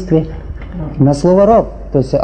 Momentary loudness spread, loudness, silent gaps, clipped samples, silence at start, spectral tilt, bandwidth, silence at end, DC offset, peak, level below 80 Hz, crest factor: 17 LU; -12 LUFS; none; 0.1%; 0 s; -8.5 dB/octave; 9.4 kHz; 0 s; under 0.1%; 0 dBFS; -28 dBFS; 12 dB